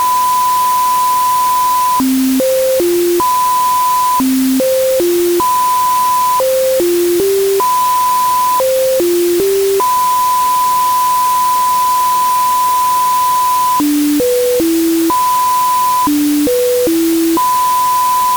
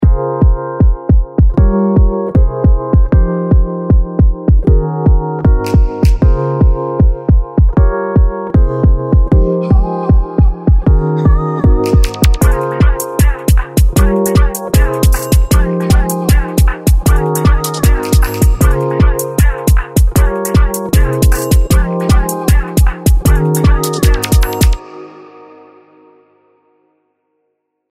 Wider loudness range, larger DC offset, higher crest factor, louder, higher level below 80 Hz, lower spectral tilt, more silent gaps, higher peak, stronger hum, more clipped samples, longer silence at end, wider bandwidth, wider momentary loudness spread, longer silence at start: about the same, 0 LU vs 1 LU; neither; about the same, 6 dB vs 10 dB; about the same, -12 LUFS vs -12 LUFS; second, -46 dBFS vs -12 dBFS; second, -2.5 dB/octave vs -6.5 dB/octave; neither; second, -4 dBFS vs 0 dBFS; neither; neither; second, 0 s vs 2.7 s; first, over 20 kHz vs 16 kHz; about the same, 1 LU vs 2 LU; about the same, 0 s vs 0 s